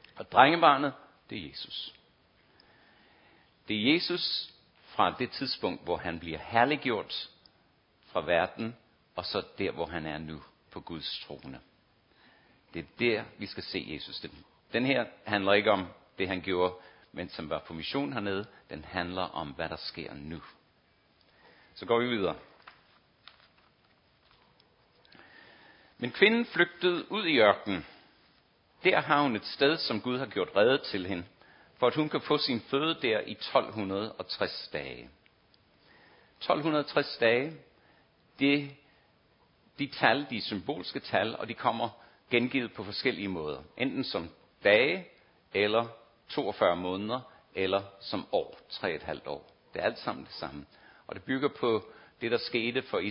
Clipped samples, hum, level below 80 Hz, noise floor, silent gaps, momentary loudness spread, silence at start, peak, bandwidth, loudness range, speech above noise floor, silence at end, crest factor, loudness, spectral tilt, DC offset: under 0.1%; none; -62 dBFS; -67 dBFS; none; 17 LU; 0.15 s; -4 dBFS; 5.6 kHz; 8 LU; 37 dB; 0 s; 28 dB; -30 LUFS; -8.5 dB/octave; under 0.1%